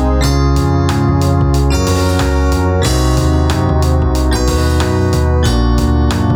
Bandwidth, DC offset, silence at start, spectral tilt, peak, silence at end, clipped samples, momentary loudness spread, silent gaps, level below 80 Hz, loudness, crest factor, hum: 18.5 kHz; under 0.1%; 0 s; -6 dB/octave; -2 dBFS; 0 s; under 0.1%; 1 LU; none; -16 dBFS; -13 LUFS; 10 dB; none